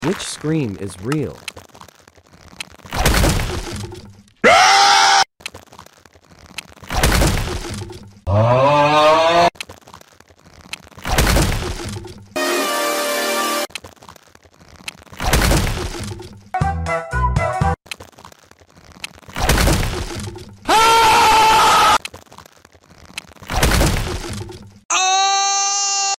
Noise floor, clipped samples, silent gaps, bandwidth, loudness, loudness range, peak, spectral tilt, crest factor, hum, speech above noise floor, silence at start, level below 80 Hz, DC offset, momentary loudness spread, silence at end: -48 dBFS; under 0.1%; 24.85-24.89 s; 16.5 kHz; -16 LUFS; 8 LU; -2 dBFS; -3 dB/octave; 16 dB; none; 26 dB; 0 s; -28 dBFS; under 0.1%; 22 LU; 0.05 s